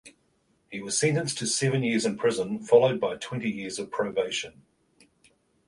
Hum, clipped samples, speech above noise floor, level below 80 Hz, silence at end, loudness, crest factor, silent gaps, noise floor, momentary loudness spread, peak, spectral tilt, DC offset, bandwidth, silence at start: none; under 0.1%; 43 dB; -66 dBFS; 1.2 s; -26 LUFS; 22 dB; none; -69 dBFS; 12 LU; -6 dBFS; -4 dB/octave; under 0.1%; 11.5 kHz; 0.05 s